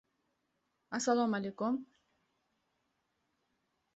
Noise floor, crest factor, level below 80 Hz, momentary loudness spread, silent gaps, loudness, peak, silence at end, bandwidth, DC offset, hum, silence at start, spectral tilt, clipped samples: -82 dBFS; 22 dB; -82 dBFS; 8 LU; none; -35 LUFS; -18 dBFS; 2.1 s; 8 kHz; under 0.1%; none; 0.9 s; -4.5 dB/octave; under 0.1%